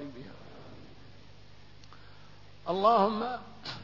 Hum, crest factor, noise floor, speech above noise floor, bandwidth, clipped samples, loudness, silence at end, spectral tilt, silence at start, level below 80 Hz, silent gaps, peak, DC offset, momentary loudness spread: 50 Hz at -60 dBFS; 22 dB; -55 dBFS; 27 dB; 6 kHz; under 0.1%; -28 LUFS; 0 s; -6.5 dB/octave; 0 s; -62 dBFS; none; -12 dBFS; 0.3%; 27 LU